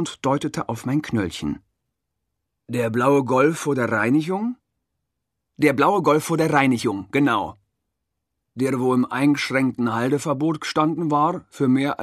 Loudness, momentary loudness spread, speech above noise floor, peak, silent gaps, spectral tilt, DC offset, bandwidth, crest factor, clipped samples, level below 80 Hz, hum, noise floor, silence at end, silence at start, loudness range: -21 LUFS; 9 LU; 59 dB; -2 dBFS; none; -6 dB/octave; under 0.1%; 14 kHz; 20 dB; under 0.1%; -58 dBFS; none; -80 dBFS; 0 s; 0 s; 2 LU